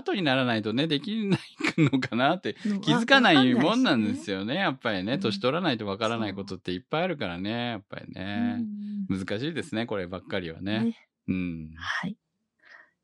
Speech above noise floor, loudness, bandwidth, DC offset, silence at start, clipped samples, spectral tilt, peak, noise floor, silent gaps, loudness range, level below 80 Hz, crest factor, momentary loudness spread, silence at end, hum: 33 dB; -27 LUFS; 11 kHz; under 0.1%; 0.05 s; under 0.1%; -5.5 dB/octave; -4 dBFS; -59 dBFS; none; 9 LU; -64 dBFS; 24 dB; 12 LU; 0.25 s; none